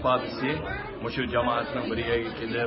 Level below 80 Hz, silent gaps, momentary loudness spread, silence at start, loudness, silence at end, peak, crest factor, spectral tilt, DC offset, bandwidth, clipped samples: -46 dBFS; none; 6 LU; 0 s; -28 LUFS; 0 s; -12 dBFS; 16 dB; -10 dB/octave; under 0.1%; 5.8 kHz; under 0.1%